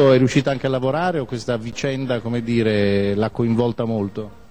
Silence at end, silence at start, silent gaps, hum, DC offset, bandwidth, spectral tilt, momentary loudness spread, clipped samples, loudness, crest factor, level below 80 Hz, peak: 0.15 s; 0 s; none; none; 0.6%; 9.8 kHz; -7 dB/octave; 7 LU; under 0.1%; -20 LUFS; 16 dB; -48 dBFS; -2 dBFS